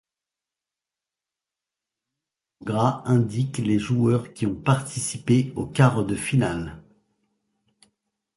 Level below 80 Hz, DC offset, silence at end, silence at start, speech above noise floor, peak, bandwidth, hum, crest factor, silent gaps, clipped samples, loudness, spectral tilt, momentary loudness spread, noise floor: -52 dBFS; under 0.1%; 1.55 s; 2.6 s; 67 dB; -2 dBFS; 11.5 kHz; none; 22 dB; none; under 0.1%; -23 LUFS; -6.5 dB/octave; 9 LU; -89 dBFS